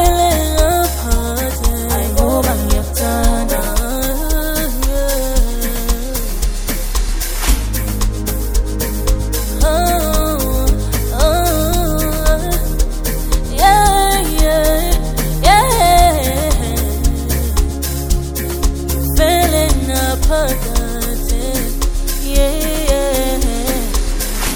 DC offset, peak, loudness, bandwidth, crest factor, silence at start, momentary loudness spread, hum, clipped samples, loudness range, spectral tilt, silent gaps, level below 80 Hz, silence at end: under 0.1%; 0 dBFS; -16 LUFS; over 20 kHz; 14 dB; 0 s; 8 LU; none; under 0.1%; 5 LU; -4.5 dB/octave; none; -16 dBFS; 0 s